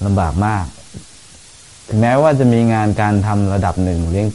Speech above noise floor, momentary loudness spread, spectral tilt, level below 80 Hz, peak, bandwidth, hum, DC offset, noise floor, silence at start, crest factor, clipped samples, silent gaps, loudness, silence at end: 27 dB; 15 LU; -7.5 dB/octave; -34 dBFS; -2 dBFS; 11.5 kHz; none; 0.7%; -41 dBFS; 0 s; 14 dB; under 0.1%; none; -15 LUFS; 0 s